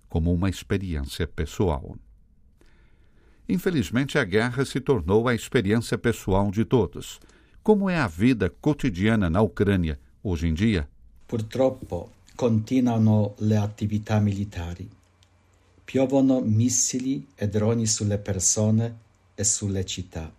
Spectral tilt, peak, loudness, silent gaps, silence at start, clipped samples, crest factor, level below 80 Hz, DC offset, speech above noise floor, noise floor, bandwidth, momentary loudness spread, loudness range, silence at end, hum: -5.5 dB/octave; -6 dBFS; -24 LUFS; none; 0.1 s; under 0.1%; 20 dB; -44 dBFS; under 0.1%; 36 dB; -60 dBFS; 15.5 kHz; 11 LU; 4 LU; 0.05 s; none